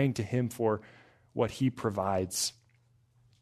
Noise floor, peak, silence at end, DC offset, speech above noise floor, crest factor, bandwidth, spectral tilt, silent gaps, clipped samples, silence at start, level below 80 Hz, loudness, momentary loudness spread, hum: -67 dBFS; -14 dBFS; 0.9 s; under 0.1%; 36 dB; 18 dB; 13.5 kHz; -5 dB/octave; none; under 0.1%; 0 s; -66 dBFS; -32 LUFS; 4 LU; none